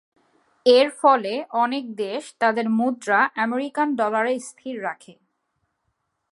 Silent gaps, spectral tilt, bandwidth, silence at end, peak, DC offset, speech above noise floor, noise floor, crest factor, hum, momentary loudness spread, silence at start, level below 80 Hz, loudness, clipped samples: none; -4 dB/octave; 11.5 kHz; 1.2 s; -2 dBFS; under 0.1%; 53 dB; -75 dBFS; 20 dB; none; 13 LU; 0.65 s; -82 dBFS; -22 LUFS; under 0.1%